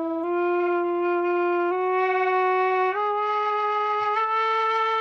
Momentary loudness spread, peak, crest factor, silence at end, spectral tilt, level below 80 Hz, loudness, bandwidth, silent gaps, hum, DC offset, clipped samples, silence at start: 2 LU; -12 dBFS; 10 dB; 0 s; -4.5 dB/octave; -78 dBFS; -23 LUFS; 6.2 kHz; none; none; under 0.1%; under 0.1%; 0 s